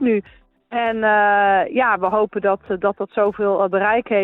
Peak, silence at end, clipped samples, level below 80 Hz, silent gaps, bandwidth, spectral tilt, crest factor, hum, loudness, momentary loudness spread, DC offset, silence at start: -6 dBFS; 0 s; under 0.1%; -56 dBFS; none; 4.1 kHz; -8.5 dB/octave; 14 dB; none; -18 LUFS; 7 LU; under 0.1%; 0 s